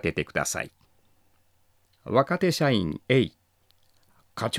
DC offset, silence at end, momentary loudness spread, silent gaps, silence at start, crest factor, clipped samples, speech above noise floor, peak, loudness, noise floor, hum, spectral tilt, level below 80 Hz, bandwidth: under 0.1%; 0 s; 13 LU; none; 0.05 s; 22 dB; under 0.1%; 40 dB; -6 dBFS; -26 LUFS; -64 dBFS; none; -5 dB/octave; -58 dBFS; 16 kHz